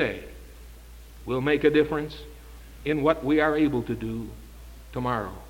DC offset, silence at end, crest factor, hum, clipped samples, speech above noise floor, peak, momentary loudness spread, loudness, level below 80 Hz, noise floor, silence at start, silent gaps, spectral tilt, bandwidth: under 0.1%; 0 s; 20 dB; none; under 0.1%; 20 dB; -6 dBFS; 25 LU; -25 LUFS; -44 dBFS; -45 dBFS; 0 s; none; -7 dB/octave; 17 kHz